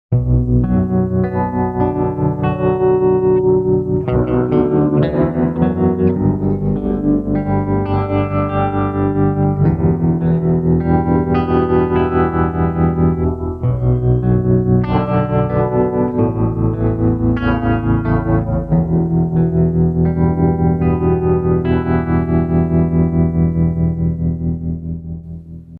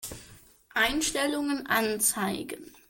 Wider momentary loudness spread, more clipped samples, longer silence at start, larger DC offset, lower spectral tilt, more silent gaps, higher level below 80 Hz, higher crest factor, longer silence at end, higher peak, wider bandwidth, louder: second, 3 LU vs 14 LU; neither; about the same, 0.1 s vs 0 s; neither; first, -12 dB/octave vs -2 dB/octave; neither; first, -28 dBFS vs -54 dBFS; about the same, 14 dB vs 18 dB; second, 0 s vs 0.2 s; first, -2 dBFS vs -12 dBFS; second, 4.2 kHz vs 17 kHz; first, -16 LUFS vs -27 LUFS